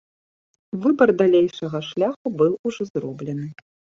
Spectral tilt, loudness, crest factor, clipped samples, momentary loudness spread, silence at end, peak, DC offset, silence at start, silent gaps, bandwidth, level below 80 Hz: -7 dB/octave; -21 LUFS; 18 dB; under 0.1%; 13 LU; 0.45 s; -4 dBFS; under 0.1%; 0.75 s; 2.16-2.25 s, 2.59-2.64 s, 2.90-2.94 s; 7.4 kHz; -66 dBFS